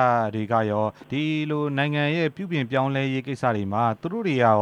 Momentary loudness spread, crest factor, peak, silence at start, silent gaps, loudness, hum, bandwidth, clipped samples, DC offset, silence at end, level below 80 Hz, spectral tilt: 5 LU; 18 dB; -6 dBFS; 0 s; none; -24 LUFS; none; 10 kHz; under 0.1%; under 0.1%; 0 s; -66 dBFS; -7.5 dB/octave